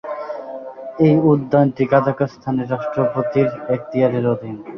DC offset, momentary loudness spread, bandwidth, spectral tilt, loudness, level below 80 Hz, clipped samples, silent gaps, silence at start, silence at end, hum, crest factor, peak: under 0.1%; 14 LU; 6.2 kHz; -10 dB/octave; -18 LUFS; -56 dBFS; under 0.1%; none; 0.05 s; 0 s; none; 16 dB; -2 dBFS